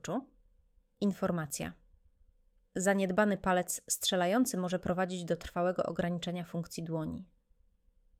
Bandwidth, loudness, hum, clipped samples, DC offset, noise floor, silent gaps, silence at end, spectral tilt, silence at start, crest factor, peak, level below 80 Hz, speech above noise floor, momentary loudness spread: 17 kHz; -33 LUFS; none; under 0.1%; under 0.1%; -69 dBFS; none; 0.95 s; -4.5 dB/octave; 0.05 s; 20 dB; -14 dBFS; -62 dBFS; 36 dB; 10 LU